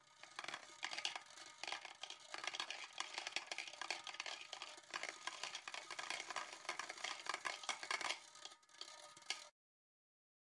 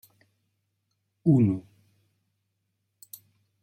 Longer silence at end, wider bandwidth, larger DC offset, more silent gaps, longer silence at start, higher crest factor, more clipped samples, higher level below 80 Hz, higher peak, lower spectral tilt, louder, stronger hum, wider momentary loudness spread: second, 1 s vs 2.05 s; second, 12 kHz vs 16.5 kHz; neither; neither; second, 0 s vs 1.25 s; first, 28 dB vs 20 dB; neither; second, under -90 dBFS vs -72 dBFS; second, -22 dBFS vs -10 dBFS; second, 1 dB/octave vs -10 dB/octave; second, -47 LUFS vs -25 LUFS; neither; second, 10 LU vs 25 LU